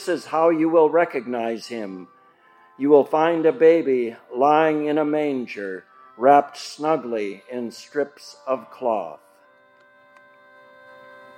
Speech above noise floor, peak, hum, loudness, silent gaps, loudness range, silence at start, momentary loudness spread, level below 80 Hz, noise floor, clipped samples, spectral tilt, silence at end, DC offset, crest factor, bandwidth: 34 dB; -2 dBFS; none; -21 LUFS; none; 11 LU; 0 s; 15 LU; -84 dBFS; -55 dBFS; under 0.1%; -6 dB/octave; 2.2 s; under 0.1%; 20 dB; 12 kHz